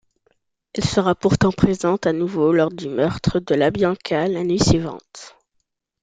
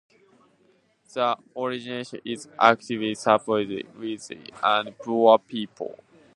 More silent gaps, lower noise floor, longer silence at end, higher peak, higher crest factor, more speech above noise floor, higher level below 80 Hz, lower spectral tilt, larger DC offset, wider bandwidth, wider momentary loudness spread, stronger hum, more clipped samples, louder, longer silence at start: neither; first, -73 dBFS vs -63 dBFS; first, 0.75 s vs 0.45 s; about the same, -2 dBFS vs 0 dBFS; second, 18 dB vs 24 dB; first, 54 dB vs 39 dB; first, -42 dBFS vs -72 dBFS; first, -6 dB/octave vs -4.5 dB/octave; neither; second, 9.4 kHz vs 11.5 kHz; second, 9 LU vs 15 LU; neither; neither; first, -19 LUFS vs -24 LUFS; second, 0.75 s vs 1.15 s